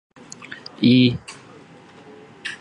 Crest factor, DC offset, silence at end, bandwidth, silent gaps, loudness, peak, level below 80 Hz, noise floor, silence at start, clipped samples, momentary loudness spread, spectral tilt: 20 dB; under 0.1%; 0.05 s; 10 kHz; none; -17 LUFS; -4 dBFS; -56 dBFS; -46 dBFS; 0.5 s; under 0.1%; 26 LU; -6 dB/octave